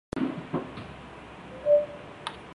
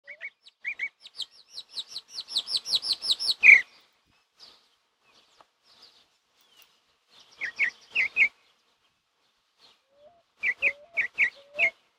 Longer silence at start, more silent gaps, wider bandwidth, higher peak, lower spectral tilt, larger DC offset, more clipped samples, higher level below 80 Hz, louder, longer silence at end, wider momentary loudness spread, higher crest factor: about the same, 0.15 s vs 0.1 s; neither; second, 11 kHz vs 17 kHz; second, -12 dBFS vs -4 dBFS; first, -7 dB/octave vs 1.5 dB/octave; neither; neither; first, -56 dBFS vs -74 dBFS; second, -29 LUFS vs -23 LUFS; second, 0 s vs 0.3 s; about the same, 20 LU vs 21 LU; second, 18 dB vs 26 dB